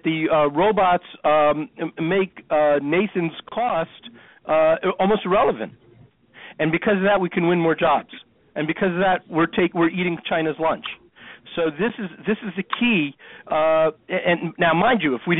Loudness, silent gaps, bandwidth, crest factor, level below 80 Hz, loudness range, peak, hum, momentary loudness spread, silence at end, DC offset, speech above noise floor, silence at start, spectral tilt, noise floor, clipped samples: -21 LUFS; none; 4.1 kHz; 16 dB; -54 dBFS; 3 LU; -6 dBFS; none; 10 LU; 0 s; under 0.1%; 32 dB; 0.05 s; -4 dB/octave; -52 dBFS; under 0.1%